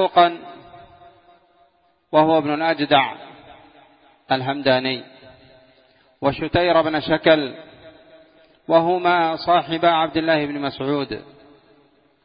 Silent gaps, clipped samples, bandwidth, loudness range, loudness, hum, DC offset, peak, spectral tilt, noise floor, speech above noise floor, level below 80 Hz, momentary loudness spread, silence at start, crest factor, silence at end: none; under 0.1%; 5.2 kHz; 3 LU; -19 LUFS; none; under 0.1%; 0 dBFS; -10 dB/octave; -60 dBFS; 42 dB; -54 dBFS; 13 LU; 0 s; 20 dB; 1.05 s